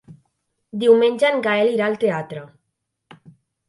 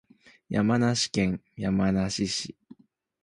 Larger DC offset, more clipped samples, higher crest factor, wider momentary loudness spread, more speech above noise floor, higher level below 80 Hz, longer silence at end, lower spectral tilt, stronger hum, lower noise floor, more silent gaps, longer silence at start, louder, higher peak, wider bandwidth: neither; neither; about the same, 18 dB vs 18 dB; first, 19 LU vs 8 LU; first, 59 dB vs 29 dB; second, -70 dBFS vs -52 dBFS; first, 1.2 s vs 0.7 s; about the same, -5.5 dB/octave vs -5 dB/octave; neither; first, -76 dBFS vs -55 dBFS; neither; second, 0.1 s vs 0.5 s; first, -18 LUFS vs -27 LUFS; first, -2 dBFS vs -10 dBFS; about the same, 11.5 kHz vs 11.5 kHz